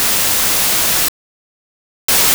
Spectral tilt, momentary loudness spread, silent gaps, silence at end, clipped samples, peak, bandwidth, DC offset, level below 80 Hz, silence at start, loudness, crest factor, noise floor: 0 dB/octave; 6 LU; 1.08-2.08 s; 0 s; under 0.1%; -2 dBFS; over 20 kHz; under 0.1%; -42 dBFS; 0 s; -12 LUFS; 14 dB; under -90 dBFS